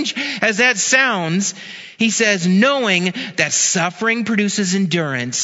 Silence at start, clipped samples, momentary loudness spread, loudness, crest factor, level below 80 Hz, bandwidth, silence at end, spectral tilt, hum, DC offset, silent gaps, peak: 0 s; under 0.1%; 7 LU; -16 LUFS; 18 dB; -66 dBFS; 8 kHz; 0 s; -3 dB/octave; none; under 0.1%; none; 0 dBFS